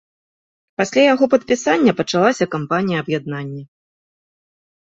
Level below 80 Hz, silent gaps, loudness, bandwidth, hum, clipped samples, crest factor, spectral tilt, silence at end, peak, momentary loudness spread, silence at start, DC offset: -60 dBFS; none; -17 LUFS; 8 kHz; none; under 0.1%; 18 dB; -5 dB/octave; 1.2 s; -2 dBFS; 14 LU; 0.8 s; under 0.1%